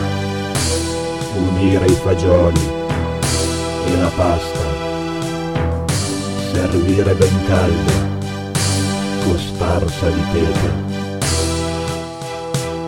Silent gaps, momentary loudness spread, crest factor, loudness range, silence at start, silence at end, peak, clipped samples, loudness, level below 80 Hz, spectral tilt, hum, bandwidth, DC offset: none; 8 LU; 16 dB; 3 LU; 0 s; 0 s; 0 dBFS; under 0.1%; -18 LUFS; -30 dBFS; -5.5 dB/octave; none; 17 kHz; 0.5%